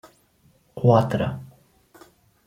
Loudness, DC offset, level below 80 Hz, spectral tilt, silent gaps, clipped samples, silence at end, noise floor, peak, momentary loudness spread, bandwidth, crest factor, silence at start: -21 LUFS; under 0.1%; -56 dBFS; -8.5 dB/octave; none; under 0.1%; 1 s; -61 dBFS; -4 dBFS; 21 LU; 14 kHz; 22 dB; 0.75 s